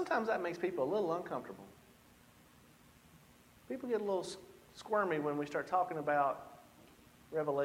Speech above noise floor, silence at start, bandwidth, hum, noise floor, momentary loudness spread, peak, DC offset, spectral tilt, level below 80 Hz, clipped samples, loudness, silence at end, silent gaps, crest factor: 27 dB; 0 s; 16.5 kHz; none; -63 dBFS; 20 LU; -18 dBFS; under 0.1%; -5.5 dB/octave; -74 dBFS; under 0.1%; -37 LUFS; 0 s; none; 20 dB